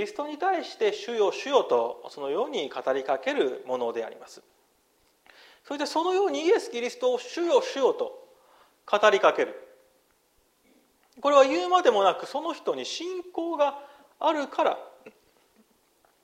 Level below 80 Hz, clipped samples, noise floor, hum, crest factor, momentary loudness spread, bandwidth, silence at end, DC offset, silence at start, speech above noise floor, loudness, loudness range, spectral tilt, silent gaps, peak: -78 dBFS; under 0.1%; -67 dBFS; none; 20 dB; 12 LU; 14 kHz; 1.15 s; under 0.1%; 0 s; 41 dB; -26 LUFS; 6 LU; -2.5 dB/octave; none; -6 dBFS